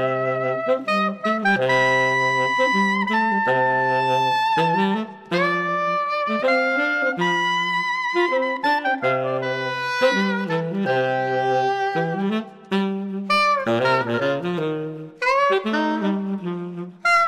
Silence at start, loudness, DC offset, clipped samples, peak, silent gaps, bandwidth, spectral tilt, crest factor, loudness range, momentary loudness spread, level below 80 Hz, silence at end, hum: 0 s; -21 LUFS; under 0.1%; under 0.1%; -6 dBFS; none; 13.5 kHz; -5.5 dB/octave; 16 dB; 3 LU; 7 LU; -70 dBFS; 0 s; none